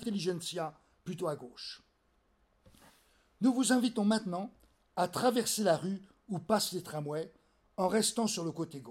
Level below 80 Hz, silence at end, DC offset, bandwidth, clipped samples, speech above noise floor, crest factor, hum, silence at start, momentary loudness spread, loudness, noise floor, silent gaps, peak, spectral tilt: -72 dBFS; 0 s; under 0.1%; 16.5 kHz; under 0.1%; 40 dB; 18 dB; none; 0 s; 16 LU; -33 LUFS; -73 dBFS; none; -16 dBFS; -4 dB/octave